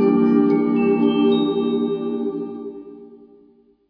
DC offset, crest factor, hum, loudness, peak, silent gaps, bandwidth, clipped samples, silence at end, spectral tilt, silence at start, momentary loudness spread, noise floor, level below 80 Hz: under 0.1%; 14 dB; none; -19 LUFS; -4 dBFS; none; 5.2 kHz; under 0.1%; 0.75 s; -10 dB/octave; 0 s; 17 LU; -54 dBFS; -60 dBFS